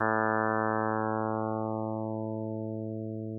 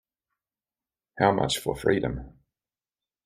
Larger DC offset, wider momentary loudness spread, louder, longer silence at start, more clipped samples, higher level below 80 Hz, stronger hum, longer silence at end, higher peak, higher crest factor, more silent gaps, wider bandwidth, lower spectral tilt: neither; about the same, 9 LU vs 9 LU; second, -31 LUFS vs -26 LUFS; second, 0 s vs 1.15 s; neither; second, -86 dBFS vs -50 dBFS; neither; second, 0 s vs 0.95 s; second, -14 dBFS vs -6 dBFS; second, 16 dB vs 24 dB; neither; second, 1.9 kHz vs 15.5 kHz; first, -13.5 dB/octave vs -5 dB/octave